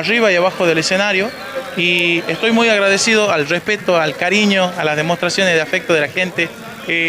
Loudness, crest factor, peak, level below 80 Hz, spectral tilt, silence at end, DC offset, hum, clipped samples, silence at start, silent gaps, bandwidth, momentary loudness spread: -14 LUFS; 12 dB; -4 dBFS; -60 dBFS; -3.5 dB/octave; 0 s; under 0.1%; none; under 0.1%; 0 s; none; 16 kHz; 6 LU